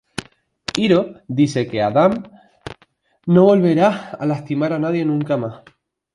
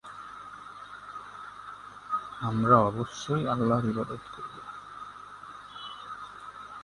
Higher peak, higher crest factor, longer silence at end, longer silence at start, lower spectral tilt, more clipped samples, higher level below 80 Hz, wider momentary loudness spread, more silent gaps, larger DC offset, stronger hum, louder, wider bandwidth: first, 0 dBFS vs -6 dBFS; second, 18 dB vs 26 dB; first, 0.6 s vs 0 s; first, 0.2 s vs 0.05 s; about the same, -7 dB/octave vs -7 dB/octave; neither; about the same, -56 dBFS vs -60 dBFS; about the same, 19 LU vs 21 LU; neither; neither; second, none vs 50 Hz at -55 dBFS; first, -18 LUFS vs -29 LUFS; about the same, 11.5 kHz vs 11.5 kHz